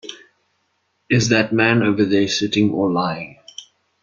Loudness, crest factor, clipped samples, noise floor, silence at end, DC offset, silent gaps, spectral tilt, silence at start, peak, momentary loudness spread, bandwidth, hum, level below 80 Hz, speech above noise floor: -17 LUFS; 18 dB; under 0.1%; -68 dBFS; 0.4 s; under 0.1%; none; -5 dB/octave; 0.05 s; -2 dBFS; 21 LU; 7.4 kHz; none; -56 dBFS; 51 dB